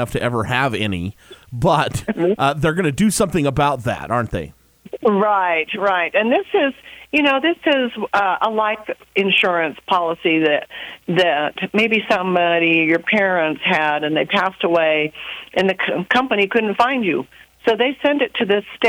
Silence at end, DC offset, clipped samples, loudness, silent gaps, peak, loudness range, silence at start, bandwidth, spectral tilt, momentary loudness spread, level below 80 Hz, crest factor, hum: 0 s; under 0.1%; under 0.1%; -18 LUFS; none; -2 dBFS; 2 LU; 0 s; over 20 kHz; -5 dB/octave; 7 LU; -46 dBFS; 16 dB; none